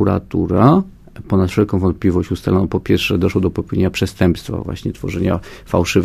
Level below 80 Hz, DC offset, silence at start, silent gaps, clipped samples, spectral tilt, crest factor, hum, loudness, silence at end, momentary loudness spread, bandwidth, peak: -30 dBFS; under 0.1%; 0 s; none; under 0.1%; -7 dB/octave; 16 dB; none; -17 LUFS; 0 s; 10 LU; 15 kHz; 0 dBFS